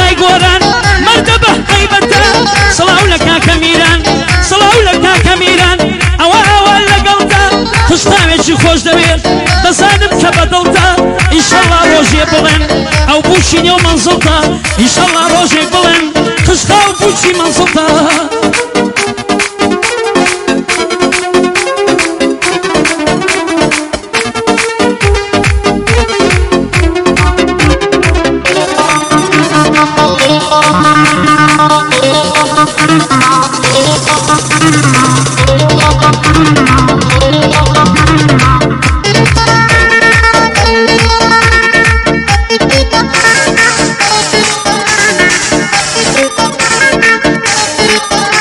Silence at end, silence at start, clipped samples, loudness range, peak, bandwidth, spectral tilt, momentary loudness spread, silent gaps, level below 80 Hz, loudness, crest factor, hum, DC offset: 0 s; 0 s; 1%; 4 LU; 0 dBFS; 15.5 kHz; -3.5 dB/octave; 5 LU; none; -20 dBFS; -7 LUFS; 8 dB; none; under 0.1%